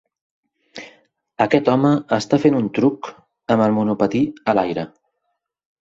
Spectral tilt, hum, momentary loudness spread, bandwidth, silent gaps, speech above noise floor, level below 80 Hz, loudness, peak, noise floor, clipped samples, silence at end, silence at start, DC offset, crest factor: -7 dB/octave; none; 19 LU; 7.8 kHz; none; 57 dB; -58 dBFS; -18 LUFS; 0 dBFS; -75 dBFS; under 0.1%; 1.05 s; 0.75 s; under 0.1%; 20 dB